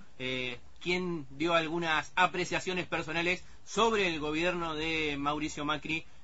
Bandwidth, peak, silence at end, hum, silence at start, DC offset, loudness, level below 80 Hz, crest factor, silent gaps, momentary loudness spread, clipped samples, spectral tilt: 8 kHz; -10 dBFS; 0.2 s; none; 0.2 s; 0.5%; -31 LUFS; -56 dBFS; 22 dB; none; 7 LU; under 0.1%; -4 dB/octave